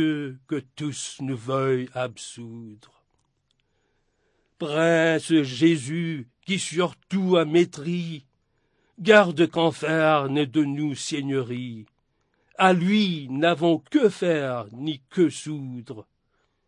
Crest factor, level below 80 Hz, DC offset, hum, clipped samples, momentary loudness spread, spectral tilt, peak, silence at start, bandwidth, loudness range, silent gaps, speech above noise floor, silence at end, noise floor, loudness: 22 dB; -72 dBFS; under 0.1%; none; under 0.1%; 16 LU; -5.5 dB/octave; -2 dBFS; 0 s; 11 kHz; 9 LU; none; 48 dB; 0.65 s; -71 dBFS; -23 LUFS